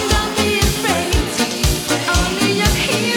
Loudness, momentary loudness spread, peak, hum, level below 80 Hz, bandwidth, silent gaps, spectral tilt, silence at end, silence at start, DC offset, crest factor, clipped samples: -16 LUFS; 3 LU; -2 dBFS; none; -24 dBFS; 19.5 kHz; none; -3.5 dB/octave; 0 s; 0 s; 0.1%; 14 dB; under 0.1%